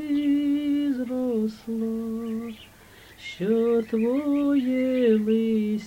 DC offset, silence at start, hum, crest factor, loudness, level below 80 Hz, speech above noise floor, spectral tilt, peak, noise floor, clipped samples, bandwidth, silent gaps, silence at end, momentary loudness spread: under 0.1%; 0 s; none; 14 dB; -25 LUFS; -60 dBFS; 26 dB; -7 dB/octave; -10 dBFS; -50 dBFS; under 0.1%; 16.5 kHz; none; 0 s; 10 LU